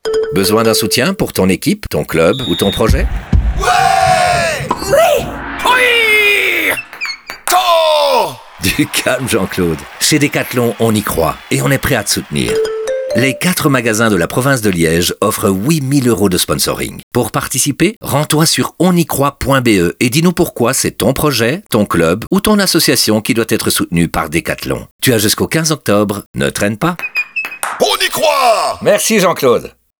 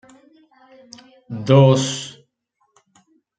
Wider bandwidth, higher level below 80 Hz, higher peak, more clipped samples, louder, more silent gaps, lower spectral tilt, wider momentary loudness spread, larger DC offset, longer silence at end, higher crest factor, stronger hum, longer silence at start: first, over 20 kHz vs 9.2 kHz; first, -30 dBFS vs -62 dBFS; about the same, 0 dBFS vs -2 dBFS; neither; first, -13 LUFS vs -16 LUFS; first, 17.03-17.11 s, 17.96-18.01 s, 24.91-24.99 s, 26.26-26.34 s vs none; second, -4 dB/octave vs -6 dB/octave; second, 7 LU vs 22 LU; neither; second, 0.3 s vs 1.3 s; second, 12 dB vs 20 dB; neither; second, 0.05 s vs 1.3 s